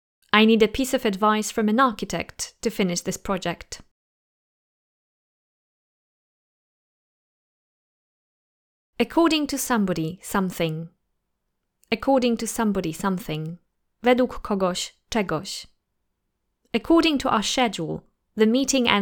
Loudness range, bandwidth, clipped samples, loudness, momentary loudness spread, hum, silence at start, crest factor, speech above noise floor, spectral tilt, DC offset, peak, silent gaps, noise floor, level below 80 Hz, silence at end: 7 LU; over 20 kHz; under 0.1%; -23 LUFS; 12 LU; none; 0.35 s; 24 dB; 54 dB; -4 dB/octave; under 0.1%; 0 dBFS; 3.91-8.93 s; -77 dBFS; -50 dBFS; 0 s